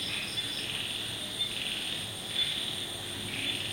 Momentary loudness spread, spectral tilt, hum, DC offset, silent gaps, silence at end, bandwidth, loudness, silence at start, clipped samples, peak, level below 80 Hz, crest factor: 5 LU; -1.5 dB/octave; none; under 0.1%; none; 0 s; 16.5 kHz; -32 LUFS; 0 s; under 0.1%; -18 dBFS; -60 dBFS; 16 dB